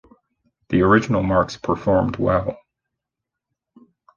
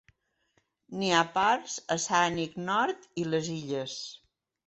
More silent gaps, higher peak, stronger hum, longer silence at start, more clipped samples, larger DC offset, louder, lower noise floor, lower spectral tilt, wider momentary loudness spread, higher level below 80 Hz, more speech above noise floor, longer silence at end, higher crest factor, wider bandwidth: neither; first, -2 dBFS vs -10 dBFS; neither; second, 0.7 s vs 0.9 s; neither; neither; first, -19 LUFS vs -29 LUFS; first, -84 dBFS vs -74 dBFS; first, -7.5 dB/octave vs -3.5 dB/octave; second, 7 LU vs 11 LU; first, -42 dBFS vs -68 dBFS; first, 65 dB vs 44 dB; first, 1.6 s vs 0.5 s; about the same, 20 dB vs 20 dB; second, 7.2 kHz vs 8.4 kHz